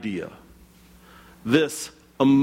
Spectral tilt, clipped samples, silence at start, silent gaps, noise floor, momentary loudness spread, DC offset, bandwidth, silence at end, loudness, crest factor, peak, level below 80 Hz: -5.5 dB/octave; under 0.1%; 0 s; none; -51 dBFS; 16 LU; under 0.1%; 16 kHz; 0 s; -24 LUFS; 18 dB; -6 dBFS; -58 dBFS